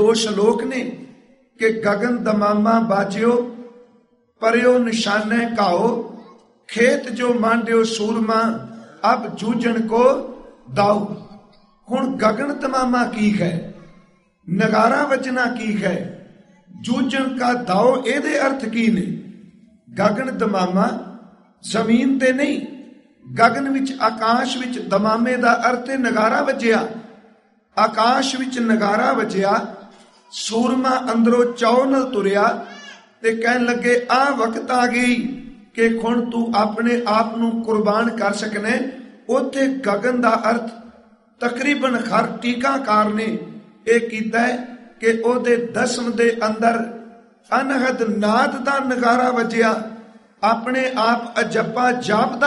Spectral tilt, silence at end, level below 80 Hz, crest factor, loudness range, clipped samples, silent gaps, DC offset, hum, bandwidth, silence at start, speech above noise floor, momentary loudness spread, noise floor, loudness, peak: -5 dB/octave; 0 s; -60 dBFS; 18 dB; 2 LU; under 0.1%; none; under 0.1%; none; 11.5 kHz; 0 s; 39 dB; 11 LU; -57 dBFS; -19 LUFS; 0 dBFS